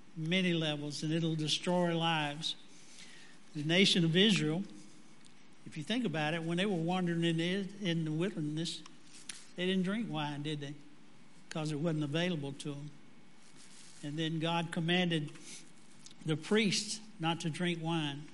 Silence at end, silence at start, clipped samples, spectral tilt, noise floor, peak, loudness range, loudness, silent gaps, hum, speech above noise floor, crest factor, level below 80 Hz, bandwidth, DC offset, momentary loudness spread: 0 s; 0.15 s; under 0.1%; -5 dB/octave; -61 dBFS; -14 dBFS; 7 LU; -33 LUFS; none; none; 27 dB; 22 dB; -78 dBFS; 11.5 kHz; 0.3%; 18 LU